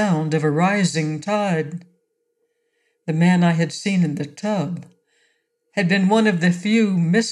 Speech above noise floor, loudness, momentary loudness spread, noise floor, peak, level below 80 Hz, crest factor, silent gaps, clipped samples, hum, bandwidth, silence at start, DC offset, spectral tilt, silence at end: 52 dB; -19 LUFS; 11 LU; -71 dBFS; -4 dBFS; -72 dBFS; 16 dB; none; under 0.1%; none; 11 kHz; 0 s; under 0.1%; -6 dB/octave; 0 s